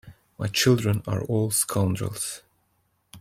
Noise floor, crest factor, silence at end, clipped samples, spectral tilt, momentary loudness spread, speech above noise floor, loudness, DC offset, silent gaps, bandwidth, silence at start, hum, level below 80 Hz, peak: -70 dBFS; 20 dB; 0 s; under 0.1%; -4.5 dB/octave; 11 LU; 46 dB; -24 LUFS; under 0.1%; none; 16.5 kHz; 0.05 s; none; -56 dBFS; -6 dBFS